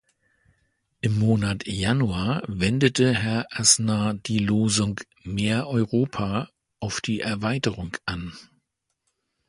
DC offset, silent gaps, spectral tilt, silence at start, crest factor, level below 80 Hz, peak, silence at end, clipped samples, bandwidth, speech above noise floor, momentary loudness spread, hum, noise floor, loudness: under 0.1%; none; -4.5 dB/octave; 1.05 s; 22 dB; -48 dBFS; -2 dBFS; 1.05 s; under 0.1%; 11.5 kHz; 53 dB; 11 LU; none; -77 dBFS; -24 LUFS